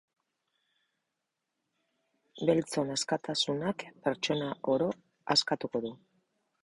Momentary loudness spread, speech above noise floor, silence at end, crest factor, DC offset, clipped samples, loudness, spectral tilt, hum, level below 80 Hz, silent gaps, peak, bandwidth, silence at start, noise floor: 8 LU; 54 dB; 0.7 s; 22 dB; under 0.1%; under 0.1%; -31 LUFS; -4 dB/octave; none; -72 dBFS; none; -12 dBFS; 11.5 kHz; 2.35 s; -86 dBFS